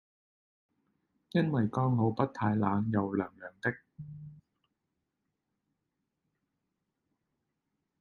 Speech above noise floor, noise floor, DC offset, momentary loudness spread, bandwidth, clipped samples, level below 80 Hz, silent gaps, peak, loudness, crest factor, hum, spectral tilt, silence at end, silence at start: 54 dB; -84 dBFS; under 0.1%; 18 LU; 6.8 kHz; under 0.1%; -70 dBFS; none; -12 dBFS; -31 LUFS; 24 dB; none; -9.5 dB/octave; 3.65 s; 1.35 s